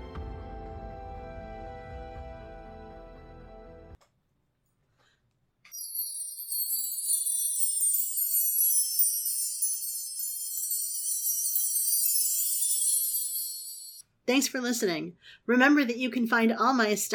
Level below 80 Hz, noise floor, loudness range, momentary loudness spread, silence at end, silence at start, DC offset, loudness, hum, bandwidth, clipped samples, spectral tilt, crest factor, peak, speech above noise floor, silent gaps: -52 dBFS; -74 dBFS; 20 LU; 20 LU; 0 s; 0 s; under 0.1%; -26 LUFS; none; 19 kHz; under 0.1%; -1.5 dB/octave; 20 dB; -10 dBFS; 48 dB; none